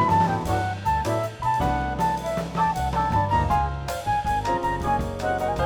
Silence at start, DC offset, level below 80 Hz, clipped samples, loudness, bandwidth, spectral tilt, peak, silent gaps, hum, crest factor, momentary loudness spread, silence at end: 0 s; under 0.1%; -36 dBFS; under 0.1%; -24 LUFS; over 20 kHz; -6 dB/octave; -10 dBFS; none; none; 14 dB; 5 LU; 0 s